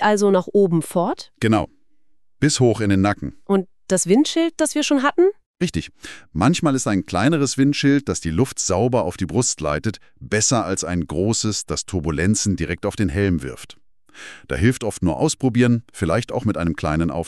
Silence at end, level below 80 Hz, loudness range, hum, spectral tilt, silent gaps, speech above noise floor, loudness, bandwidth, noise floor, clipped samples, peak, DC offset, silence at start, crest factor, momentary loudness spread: 0 s; -42 dBFS; 3 LU; none; -5 dB/octave; 5.46-5.54 s; 47 dB; -20 LUFS; 13 kHz; -67 dBFS; under 0.1%; -4 dBFS; under 0.1%; 0 s; 16 dB; 8 LU